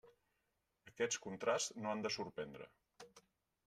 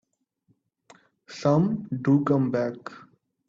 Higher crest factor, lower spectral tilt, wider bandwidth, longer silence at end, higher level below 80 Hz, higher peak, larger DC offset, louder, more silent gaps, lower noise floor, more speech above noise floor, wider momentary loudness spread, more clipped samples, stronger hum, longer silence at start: about the same, 20 dB vs 18 dB; second, -2.5 dB/octave vs -8.5 dB/octave; first, 13.5 kHz vs 7.6 kHz; about the same, 0.45 s vs 0.5 s; second, -82 dBFS vs -64 dBFS; second, -24 dBFS vs -10 dBFS; neither; second, -42 LUFS vs -24 LUFS; neither; first, -86 dBFS vs -70 dBFS; about the same, 43 dB vs 46 dB; first, 23 LU vs 20 LU; neither; neither; second, 0.05 s vs 1.3 s